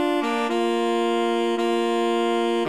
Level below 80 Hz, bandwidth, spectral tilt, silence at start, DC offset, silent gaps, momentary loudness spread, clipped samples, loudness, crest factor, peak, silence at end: -72 dBFS; 13.5 kHz; -4 dB/octave; 0 s; 0.3%; none; 1 LU; under 0.1%; -22 LUFS; 10 dB; -12 dBFS; 0 s